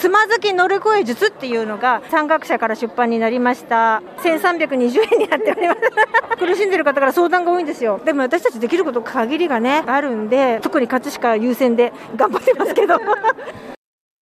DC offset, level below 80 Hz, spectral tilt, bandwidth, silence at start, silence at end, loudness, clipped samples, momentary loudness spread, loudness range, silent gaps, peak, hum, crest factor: under 0.1%; -66 dBFS; -4 dB/octave; 15.5 kHz; 0 s; 0.45 s; -17 LUFS; under 0.1%; 4 LU; 2 LU; none; -2 dBFS; none; 14 dB